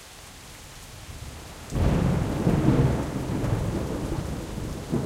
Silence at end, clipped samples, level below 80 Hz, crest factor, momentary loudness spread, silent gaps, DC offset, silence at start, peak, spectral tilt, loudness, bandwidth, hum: 0 s; under 0.1%; -36 dBFS; 20 dB; 20 LU; none; under 0.1%; 0 s; -6 dBFS; -7 dB/octave; -26 LUFS; 16 kHz; none